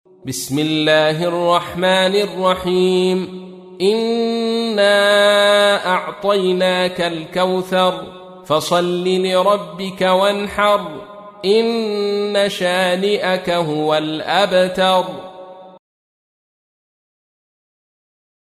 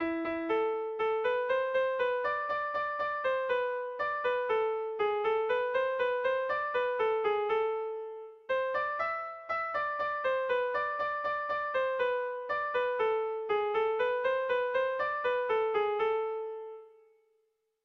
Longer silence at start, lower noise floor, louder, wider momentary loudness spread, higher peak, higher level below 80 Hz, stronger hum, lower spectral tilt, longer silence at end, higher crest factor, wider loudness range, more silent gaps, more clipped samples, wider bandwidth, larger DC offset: first, 0.25 s vs 0 s; second, -37 dBFS vs -76 dBFS; first, -16 LUFS vs -31 LUFS; first, 9 LU vs 5 LU; first, -2 dBFS vs -20 dBFS; first, -56 dBFS vs -70 dBFS; neither; about the same, -4.5 dB/octave vs -5 dB/octave; first, 2.85 s vs 0.95 s; about the same, 16 dB vs 12 dB; about the same, 4 LU vs 2 LU; neither; neither; first, 15 kHz vs 6 kHz; neither